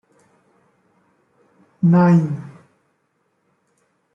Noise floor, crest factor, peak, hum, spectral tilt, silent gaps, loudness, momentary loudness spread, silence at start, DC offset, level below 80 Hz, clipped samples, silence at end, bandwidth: -68 dBFS; 18 dB; -4 dBFS; none; -10.5 dB/octave; none; -16 LUFS; 19 LU; 1.8 s; under 0.1%; -64 dBFS; under 0.1%; 1.65 s; 5.8 kHz